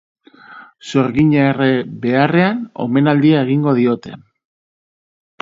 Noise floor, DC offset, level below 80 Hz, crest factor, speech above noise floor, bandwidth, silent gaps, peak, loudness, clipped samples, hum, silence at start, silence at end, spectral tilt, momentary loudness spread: -40 dBFS; under 0.1%; -52 dBFS; 16 dB; 26 dB; 7.6 kHz; none; 0 dBFS; -15 LUFS; under 0.1%; none; 0.5 s; 1.25 s; -8 dB/octave; 9 LU